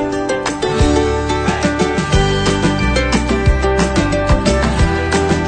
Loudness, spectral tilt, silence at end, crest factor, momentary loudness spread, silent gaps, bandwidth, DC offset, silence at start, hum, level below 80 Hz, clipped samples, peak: -15 LUFS; -5.5 dB/octave; 0 s; 14 dB; 3 LU; none; 9.4 kHz; under 0.1%; 0 s; none; -20 dBFS; under 0.1%; 0 dBFS